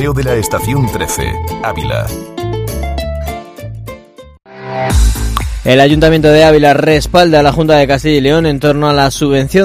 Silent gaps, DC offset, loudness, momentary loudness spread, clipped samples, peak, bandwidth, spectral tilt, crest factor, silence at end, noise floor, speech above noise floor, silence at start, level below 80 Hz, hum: none; under 0.1%; -11 LUFS; 15 LU; 0.7%; 0 dBFS; 16 kHz; -5.5 dB/octave; 10 dB; 0 s; -35 dBFS; 26 dB; 0 s; -22 dBFS; none